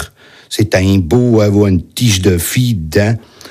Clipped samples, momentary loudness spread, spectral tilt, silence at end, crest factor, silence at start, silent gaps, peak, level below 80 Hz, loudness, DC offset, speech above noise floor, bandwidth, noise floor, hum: under 0.1%; 7 LU; -5.5 dB/octave; 0 s; 12 dB; 0 s; none; 0 dBFS; -38 dBFS; -12 LUFS; under 0.1%; 22 dB; 15.5 kHz; -33 dBFS; none